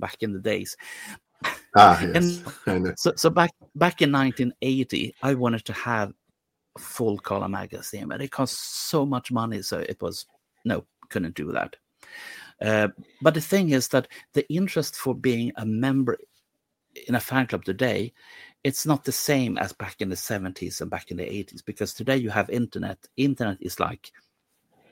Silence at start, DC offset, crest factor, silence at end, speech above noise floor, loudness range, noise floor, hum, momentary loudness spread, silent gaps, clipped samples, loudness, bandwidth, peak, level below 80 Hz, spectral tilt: 0 s; under 0.1%; 24 dB; 0.85 s; 53 dB; 8 LU; -78 dBFS; none; 13 LU; none; under 0.1%; -25 LUFS; 17 kHz; 0 dBFS; -58 dBFS; -5 dB/octave